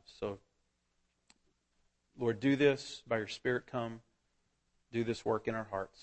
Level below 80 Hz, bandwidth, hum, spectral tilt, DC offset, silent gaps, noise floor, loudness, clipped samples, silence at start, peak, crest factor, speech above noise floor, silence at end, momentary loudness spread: -68 dBFS; 8.4 kHz; none; -6 dB/octave; under 0.1%; none; -79 dBFS; -35 LUFS; under 0.1%; 0.1 s; -16 dBFS; 22 dB; 45 dB; 0.15 s; 13 LU